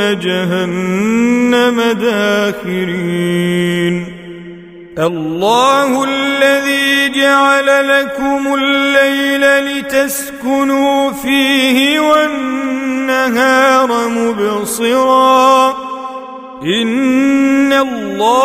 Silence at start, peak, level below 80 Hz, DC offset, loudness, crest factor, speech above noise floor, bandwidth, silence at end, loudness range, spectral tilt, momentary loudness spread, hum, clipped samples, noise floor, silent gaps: 0 s; 0 dBFS; -50 dBFS; under 0.1%; -12 LUFS; 12 dB; 20 dB; 16 kHz; 0 s; 4 LU; -4 dB/octave; 8 LU; none; under 0.1%; -32 dBFS; none